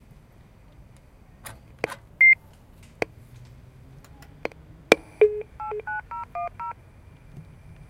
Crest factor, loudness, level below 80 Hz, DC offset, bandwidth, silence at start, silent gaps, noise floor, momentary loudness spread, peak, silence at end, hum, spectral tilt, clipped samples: 28 dB; -23 LUFS; -52 dBFS; under 0.1%; 16 kHz; 1.45 s; none; -51 dBFS; 27 LU; 0 dBFS; 0.15 s; none; -4 dB/octave; under 0.1%